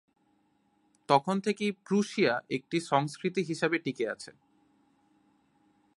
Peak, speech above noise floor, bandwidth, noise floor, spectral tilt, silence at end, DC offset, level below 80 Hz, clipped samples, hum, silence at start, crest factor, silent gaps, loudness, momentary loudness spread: -8 dBFS; 41 dB; 11.5 kHz; -71 dBFS; -5.5 dB/octave; 1.65 s; under 0.1%; -78 dBFS; under 0.1%; none; 1.1 s; 24 dB; none; -30 LUFS; 8 LU